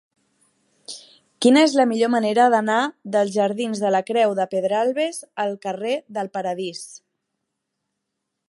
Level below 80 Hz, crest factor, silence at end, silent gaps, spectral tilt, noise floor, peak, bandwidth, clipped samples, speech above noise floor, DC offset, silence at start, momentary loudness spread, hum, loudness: -78 dBFS; 18 dB; 1.5 s; none; -4.5 dB/octave; -79 dBFS; -4 dBFS; 11.5 kHz; under 0.1%; 59 dB; under 0.1%; 0.9 s; 14 LU; none; -21 LUFS